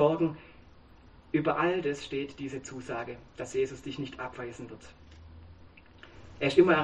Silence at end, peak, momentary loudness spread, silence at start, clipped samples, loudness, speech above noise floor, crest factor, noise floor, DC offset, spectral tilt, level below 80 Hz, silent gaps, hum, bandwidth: 0 s; -8 dBFS; 25 LU; 0 s; under 0.1%; -31 LUFS; 26 dB; 22 dB; -55 dBFS; under 0.1%; -6 dB/octave; -58 dBFS; none; none; 9.2 kHz